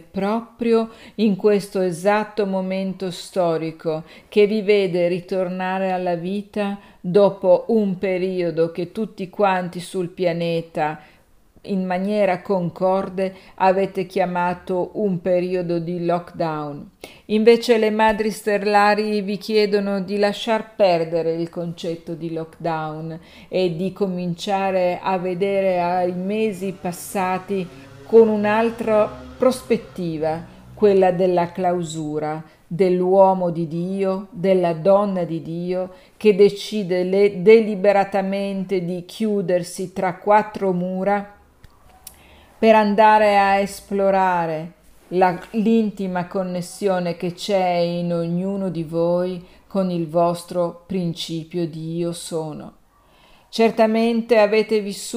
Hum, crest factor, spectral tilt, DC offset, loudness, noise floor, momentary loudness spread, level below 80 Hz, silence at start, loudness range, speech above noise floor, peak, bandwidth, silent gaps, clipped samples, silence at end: none; 18 dB; -6.5 dB/octave; under 0.1%; -20 LUFS; -54 dBFS; 12 LU; -56 dBFS; 0.15 s; 6 LU; 34 dB; -2 dBFS; 15.5 kHz; none; under 0.1%; 0 s